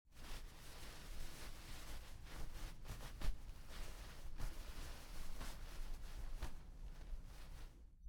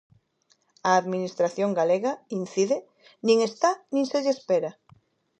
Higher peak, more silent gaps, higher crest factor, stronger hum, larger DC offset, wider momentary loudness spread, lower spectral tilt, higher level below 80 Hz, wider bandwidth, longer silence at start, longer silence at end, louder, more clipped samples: second, -28 dBFS vs -8 dBFS; neither; about the same, 18 dB vs 18 dB; neither; neither; about the same, 6 LU vs 8 LU; about the same, -4 dB/octave vs -5 dB/octave; first, -50 dBFS vs -78 dBFS; first, 19 kHz vs 8.8 kHz; second, 0.05 s vs 0.85 s; second, 0 s vs 0.7 s; second, -55 LUFS vs -25 LUFS; neither